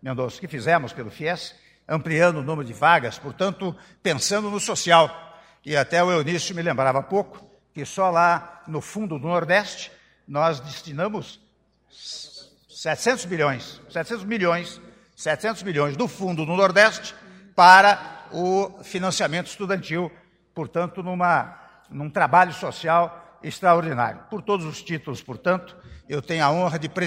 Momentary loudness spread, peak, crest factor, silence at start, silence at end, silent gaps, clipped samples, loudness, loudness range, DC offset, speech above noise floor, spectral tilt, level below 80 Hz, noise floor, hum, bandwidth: 17 LU; 0 dBFS; 22 dB; 0.05 s; 0 s; none; under 0.1%; -22 LUFS; 9 LU; under 0.1%; 41 dB; -4 dB/octave; -62 dBFS; -63 dBFS; none; 16 kHz